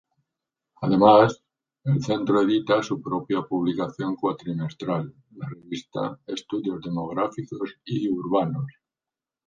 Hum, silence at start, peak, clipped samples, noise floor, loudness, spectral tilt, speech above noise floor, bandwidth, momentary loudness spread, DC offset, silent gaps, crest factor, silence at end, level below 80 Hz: none; 0.8 s; -2 dBFS; under 0.1%; under -90 dBFS; -24 LUFS; -7 dB/octave; over 66 dB; 7.6 kHz; 15 LU; under 0.1%; none; 22 dB; 0.75 s; -62 dBFS